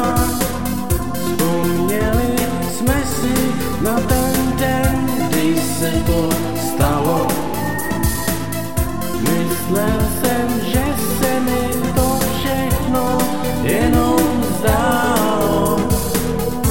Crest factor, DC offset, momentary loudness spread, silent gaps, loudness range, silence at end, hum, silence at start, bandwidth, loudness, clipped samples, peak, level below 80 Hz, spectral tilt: 14 dB; 4%; 5 LU; none; 3 LU; 0 s; none; 0 s; 17 kHz; -18 LUFS; under 0.1%; -2 dBFS; -28 dBFS; -5 dB/octave